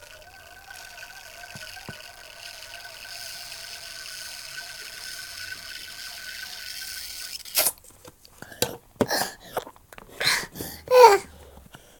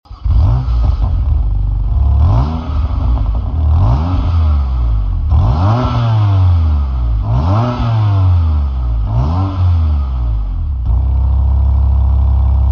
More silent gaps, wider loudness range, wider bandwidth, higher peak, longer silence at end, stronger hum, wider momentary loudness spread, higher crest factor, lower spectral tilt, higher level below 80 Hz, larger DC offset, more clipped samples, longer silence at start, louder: neither; first, 16 LU vs 2 LU; first, 18 kHz vs 5.6 kHz; about the same, 0 dBFS vs -2 dBFS; first, 0.25 s vs 0 s; neither; first, 20 LU vs 5 LU; first, 28 dB vs 10 dB; second, -1.5 dB/octave vs -9.5 dB/octave; second, -58 dBFS vs -14 dBFS; neither; neither; about the same, 0 s vs 0.1 s; second, -25 LUFS vs -14 LUFS